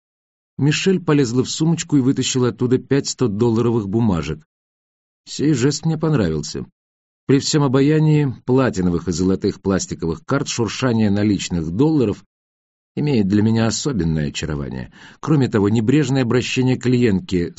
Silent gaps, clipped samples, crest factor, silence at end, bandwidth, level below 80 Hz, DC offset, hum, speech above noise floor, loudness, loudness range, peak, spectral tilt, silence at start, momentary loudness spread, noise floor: 4.46-5.24 s, 6.72-7.27 s, 12.26-12.95 s; under 0.1%; 16 dB; 0.05 s; 8 kHz; -44 dBFS; under 0.1%; none; over 72 dB; -18 LUFS; 3 LU; -2 dBFS; -6.5 dB/octave; 0.6 s; 9 LU; under -90 dBFS